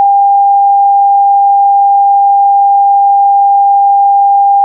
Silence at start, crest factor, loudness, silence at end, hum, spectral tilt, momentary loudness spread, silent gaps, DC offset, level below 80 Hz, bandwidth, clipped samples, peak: 0 s; 4 dB; -7 LUFS; 0 s; none; -7 dB/octave; 0 LU; none; under 0.1%; under -90 dBFS; 1 kHz; under 0.1%; -2 dBFS